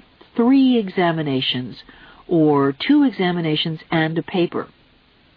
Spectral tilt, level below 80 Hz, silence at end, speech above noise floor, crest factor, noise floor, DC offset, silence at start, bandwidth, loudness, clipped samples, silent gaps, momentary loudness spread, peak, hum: -9 dB/octave; -58 dBFS; 0.7 s; 36 dB; 14 dB; -54 dBFS; under 0.1%; 0.35 s; 5 kHz; -19 LUFS; under 0.1%; none; 10 LU; -6 dBFS; none